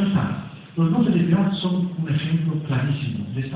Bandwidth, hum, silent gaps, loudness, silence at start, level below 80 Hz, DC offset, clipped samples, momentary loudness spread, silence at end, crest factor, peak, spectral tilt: 4 kHz; none; none; -22 LUFS; 0 s; -52 dBFS; under 0.1%; under 0.1%; 9 LU; 0 s; 14 dB; -8 dBFS; -12 dB/octave